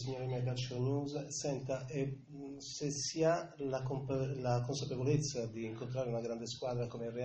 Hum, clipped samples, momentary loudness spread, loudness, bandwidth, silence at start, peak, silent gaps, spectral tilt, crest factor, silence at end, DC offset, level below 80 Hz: none; under 0.1%; 8 LU; -38 LUFS; 8.2 kHz; 0 s; -20 dBFS; none; -5.5 dB/octave; 18 dB; 0 s; under 0.1%; -64 dBFS